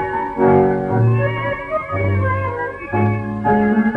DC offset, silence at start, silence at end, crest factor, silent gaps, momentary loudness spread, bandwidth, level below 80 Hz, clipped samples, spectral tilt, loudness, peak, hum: under 0.1%; 0 s; 0 s; 14 dB; none; 8 LU; 4.4 kHz; -42 dBFS; under 0.1%; -10 dB/octave; -18 LUFS; -2 dBFS; none